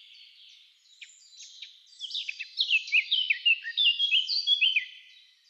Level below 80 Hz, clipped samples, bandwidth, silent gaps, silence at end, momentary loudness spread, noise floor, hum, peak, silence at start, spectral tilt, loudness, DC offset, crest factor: under -90 dBFS; under 0.1%; 8.6 kHz; none; 0.5 s; 21 LU; -58 dBFS; none; -14 dBFS; 1 s; 11.5 dB/octave; -24 LUFS; under 0.1%; 16 dB